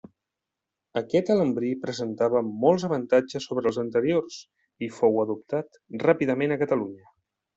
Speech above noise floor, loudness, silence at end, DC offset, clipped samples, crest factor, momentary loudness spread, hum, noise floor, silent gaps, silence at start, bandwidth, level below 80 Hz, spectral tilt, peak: 61 dB; -25 LUFS; 0.6 s; under 0.1%; under 0.1%; 20 dB; 11 LU; none; -86 dBFS; none; 0.95 s; 8 kHz; -68 dBFS; -6.5 dB/octave; -6 dBFS